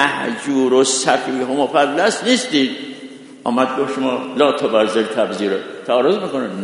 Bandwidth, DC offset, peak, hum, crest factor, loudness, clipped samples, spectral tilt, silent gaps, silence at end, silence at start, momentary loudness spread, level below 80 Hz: 11 kHz; under 0.1%; 0 dBFS; none; 18 dB; -17 LUFS; under 0.1%; -3 dB/octave; none; 0 s; 0 s; 8 LU; -68 dBFS